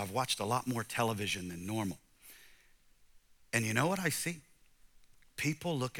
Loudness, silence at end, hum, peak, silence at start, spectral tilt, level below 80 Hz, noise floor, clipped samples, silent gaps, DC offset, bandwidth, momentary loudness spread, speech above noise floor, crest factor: -35 LUFS; 0 s; none; -14 dBFS; 0 s; -4 dB/octave; -68 dBFS; -64 dBFS; under 0.1%; none; under 0.1%; 19 kHz; 17 LU; 29 dB; 24 dB